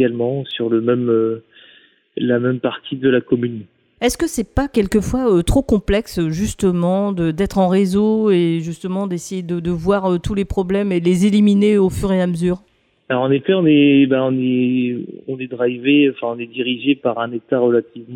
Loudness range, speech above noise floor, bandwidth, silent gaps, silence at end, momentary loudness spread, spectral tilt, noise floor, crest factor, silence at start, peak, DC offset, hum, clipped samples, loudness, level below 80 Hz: 4 LU; 34 dB; 16 kHz; none; 0 s; 9 LU; -6.5 dB/octave; -50 dBFS; 14 dB; 0 s; -4 dBFS; under 0.1%; none; under 0.1%; -17 LUFS; -36 dBFS